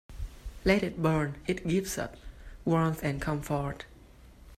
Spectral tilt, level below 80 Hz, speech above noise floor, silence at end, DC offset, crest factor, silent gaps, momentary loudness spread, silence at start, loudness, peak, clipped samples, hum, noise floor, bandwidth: -6 dB/octave; -46 dBFS; 24 dB; 0.05 s; under 0.1%; 22 dB; none; 17 LU; 0.1 s; -30 LUFS; -10 dBFS; under 0.1%; none; -53 dBFS; 15.5 kHz